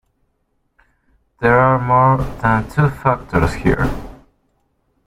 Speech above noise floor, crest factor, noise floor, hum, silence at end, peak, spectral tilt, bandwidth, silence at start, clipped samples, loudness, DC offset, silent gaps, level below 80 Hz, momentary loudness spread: 51 dB; 18 dB; -66 dBFS; none; 0.9 s; 0 dBFS; -8 dB/octave; 14.5 kHz; 1.4 s; under 0.1%; -16 LUFS; under 0.1%; none; -34 dBFS; 7 LU